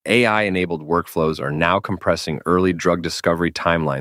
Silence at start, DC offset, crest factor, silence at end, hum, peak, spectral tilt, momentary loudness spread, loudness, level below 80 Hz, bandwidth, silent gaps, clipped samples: 0.05 s; under 0.1%; 18 dB; 0 s; none; -2 dBFS; -5.5 dB/octave; 5 LU; -19 LUFS; -46 dBFS; 16 kHz; none; under 0.1%